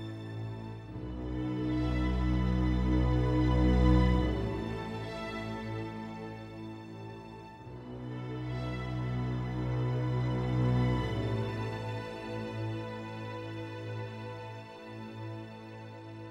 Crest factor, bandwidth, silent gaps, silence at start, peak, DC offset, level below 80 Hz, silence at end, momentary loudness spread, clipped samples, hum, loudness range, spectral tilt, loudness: 20 dB; 8.4 kHz; none; 0 s; -14 dBFS; under 0.1%; -38 dBFS; 0 s; 16 LU; under 0.1%; none; 12 LU; -8 dB/octave; -33 LUFS